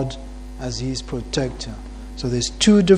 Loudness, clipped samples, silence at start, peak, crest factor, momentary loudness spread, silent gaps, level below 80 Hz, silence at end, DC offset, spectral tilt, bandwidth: -23 LUFS; under 0.1%; 0 s; -2 dBFS; 20 dB; 19 LU; none; -34 dBFS; 0 s; under 0.1%; -5 dB/octave; 11 kHz